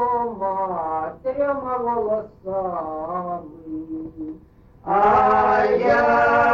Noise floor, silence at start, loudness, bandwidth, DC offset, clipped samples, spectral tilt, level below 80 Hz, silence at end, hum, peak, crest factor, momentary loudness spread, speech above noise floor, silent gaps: -48 dBFS; 0 s; -21 LUFS; 7.4 kHz; under 0.1%; under 0.1%; -7 dB/octave; -48 dBFS; 0 s; none; -6 dBFS; 14 dB; 17 LU; 27 dB; none